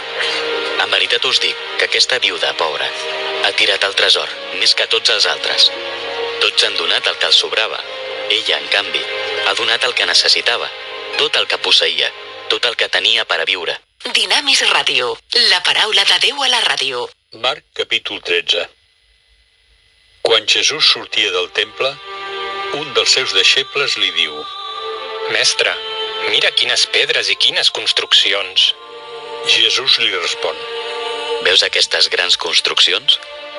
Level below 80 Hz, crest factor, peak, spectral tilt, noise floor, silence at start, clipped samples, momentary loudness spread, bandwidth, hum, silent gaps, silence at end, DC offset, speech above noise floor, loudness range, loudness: -62 dBFS; 16 dB; 0 dBFS; 0.5 dB/octave; -55 dBFS; 0 s; under 0.1%; 12 LU; 13.5 kHz; none; none; 0 s; under 0.1%; 40 dB; 3 LU; -13 LUFS